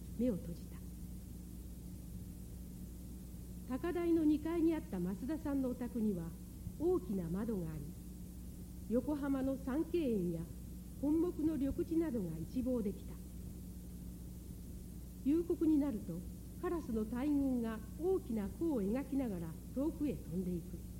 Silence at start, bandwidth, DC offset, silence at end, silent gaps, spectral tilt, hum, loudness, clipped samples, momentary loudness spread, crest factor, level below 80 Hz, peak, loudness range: 0 s; 16.5 kHz; under 0.1%; 0 s; none; -8 dB/octave; none; -38 LUFS; under 0.1%; 15 LU; 16 dB; -52 dBFS; -24 dBFS; 5 LU